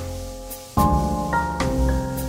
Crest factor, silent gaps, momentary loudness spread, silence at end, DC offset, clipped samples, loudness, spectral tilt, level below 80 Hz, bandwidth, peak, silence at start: 18 dB; none; 14 LU; 0 s; under 0.1%; under 0.1%; -22 LUFS; -6 dB/octave; -28 dBFS; 16.5 kHz; -6 dBFS; 0 s